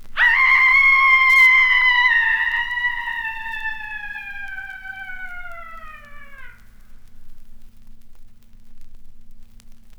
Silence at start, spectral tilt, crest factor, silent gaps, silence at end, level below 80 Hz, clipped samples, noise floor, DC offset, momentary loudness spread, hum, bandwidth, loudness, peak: 0 s; 0 dB/octave; 16 dB; none; 0.05 s; -42 dBFS; under 0.1%; -39 dBFS; under 0.1%; 22 LU; none; over 20 kHz; -14 LUFS; -4 dBFS